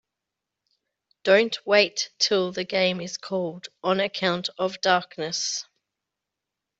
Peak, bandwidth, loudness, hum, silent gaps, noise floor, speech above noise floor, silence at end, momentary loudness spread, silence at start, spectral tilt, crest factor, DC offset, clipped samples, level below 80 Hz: -4 dBFS; 8.2 kHz; -24 LUFS; none; none; -86 dBFS; 61 dB; 1.15 s; 10 LU; 1.25 s; -3 dB/octave; 22 dB; under 0.1%; under 0.1%; -72 dBFS